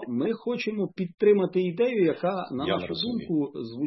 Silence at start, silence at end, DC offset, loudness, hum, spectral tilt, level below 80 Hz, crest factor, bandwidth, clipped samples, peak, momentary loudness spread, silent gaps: 0 s; 0 s; under 0.1%; -27 LUFS; none; -8 dB/octave; -68 dBFS; 16 dB; 6 kHz; under 0.1%; -10 dBFS; 8 LU; 1.14-1.18 s